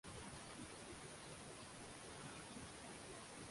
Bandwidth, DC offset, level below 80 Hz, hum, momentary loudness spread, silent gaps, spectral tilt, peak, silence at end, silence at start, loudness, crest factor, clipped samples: 11.5 kHz; under 0.1%; -70 dBFS; none; 1 LU; none; -3 dB/octave; -40 dBFS; 0 s; 0.05 s; -54 LUFS; 14 dB; under 0.1%